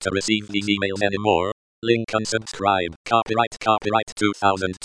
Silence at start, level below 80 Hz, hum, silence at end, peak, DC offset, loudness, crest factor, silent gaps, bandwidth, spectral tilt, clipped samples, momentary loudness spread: 0 s; -54 dBFS; none; 0 s; -4 dBFS; 0.1%; -22 LUFS; 18 dB; 1.52-1.82 s, 2.96-3.04 s, 3.47-3.51 s, 4.12-4.16 s; 10.5 kHz; -4 dB/octave; under 0.1%; 4 LU